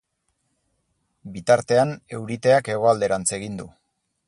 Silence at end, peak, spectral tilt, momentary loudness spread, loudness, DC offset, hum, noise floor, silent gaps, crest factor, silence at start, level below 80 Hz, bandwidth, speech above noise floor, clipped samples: 0.6 s; -4 dBFS; -4.5 dB/octave; 15 LU; -21 LUFS; under 0.1%; none; -73 dBFS; none; 20 dB; 1.25 s; -58 dBFS; 11.5 kHz; 52 dB; under 0.1%